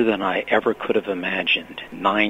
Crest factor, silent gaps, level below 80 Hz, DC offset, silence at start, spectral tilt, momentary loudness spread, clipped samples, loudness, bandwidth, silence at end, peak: 18 dB; none; -58 dBFS; under 0.1%; 0 s; -5.5 dB/octave; 4 LU; under 0.1%; -22 LUFS; 15.5 kHz; 0 s; -4 dBFS